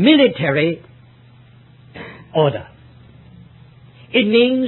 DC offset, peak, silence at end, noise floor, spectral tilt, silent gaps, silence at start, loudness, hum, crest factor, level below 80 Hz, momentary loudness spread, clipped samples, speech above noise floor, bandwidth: under 0.1%; 0 dBFS; 0 s; -46 dBFS; -11 dB/octave; none; 0 s; -16 LUFS; none; 18 dB; -54 dBFS; 22 LU; under 0.1%; 32 dB; 4.3 kHz